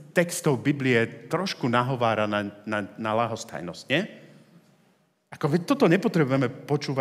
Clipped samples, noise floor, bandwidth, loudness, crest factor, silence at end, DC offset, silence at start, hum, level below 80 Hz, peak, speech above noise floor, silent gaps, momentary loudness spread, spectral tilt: under 0.1%; -65 dBFS; 16 kHz; -25 LUFS; 20 dB; 0 s; under 0.1%; 0 s; none; -76 dBFS; -6 dBFS; 40 dB; none; 9 LU; -5.5 dB/octave